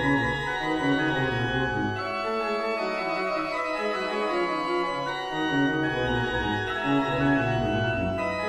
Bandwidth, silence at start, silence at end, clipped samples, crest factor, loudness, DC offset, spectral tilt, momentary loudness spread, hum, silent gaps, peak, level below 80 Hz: 12 kHz; 0 s; 0 s; under 0.1%; 14 dB; -26 LUFS; under 0.1%; -6 dB/octave; 4 LU; none; none; -12 dBFS; -46 dBFS